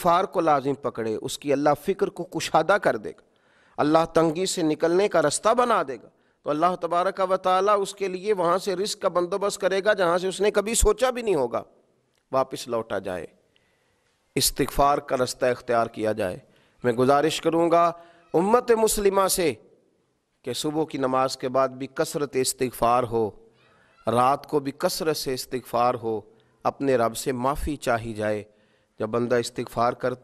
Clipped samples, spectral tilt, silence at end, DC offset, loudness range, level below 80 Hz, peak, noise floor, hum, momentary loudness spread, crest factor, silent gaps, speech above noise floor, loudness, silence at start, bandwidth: under 0.1%; -4 dB/octave; 0.05 s; under 0.1%; 4 LU; -44 dBFS; -4 dBFS; -70 dBFS; none; 9 LU; 20 dB; none; 47 dB; -24 LUFS; 0 s; 14.5 kHz